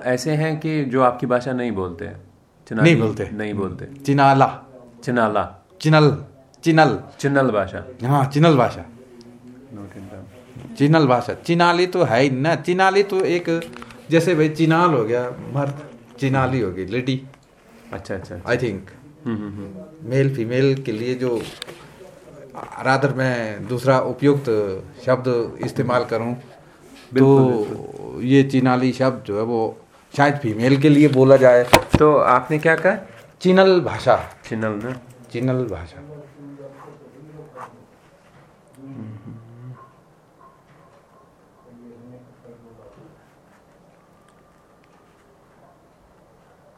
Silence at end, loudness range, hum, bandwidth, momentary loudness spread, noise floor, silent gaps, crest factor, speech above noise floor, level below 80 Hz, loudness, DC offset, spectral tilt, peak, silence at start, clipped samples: 4.25 s; 10 LU; none; 16.5 kHz; 22 LU; -53 dBFS; none; 20 dB; 35 dB; -50 dBFS; -19 LUFS; under 0.1%; -6.5 dB/octave; 0 dBFS; 0 s; under 0.1%